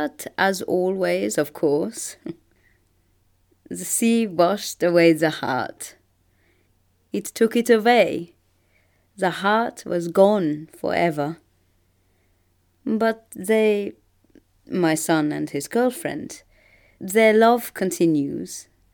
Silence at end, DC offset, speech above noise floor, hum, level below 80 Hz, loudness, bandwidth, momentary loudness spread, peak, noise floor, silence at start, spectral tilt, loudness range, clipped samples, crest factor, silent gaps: 0.3 s; under 0.1%; 43 dB; none; -66 dBFS; -21 LUFS; over 20 kHz; 17 LU; -2 dBFS; -64 dBFS; 0 s; -4.5 dB/octave; 5 LU; under 0.1%; 20 dB; none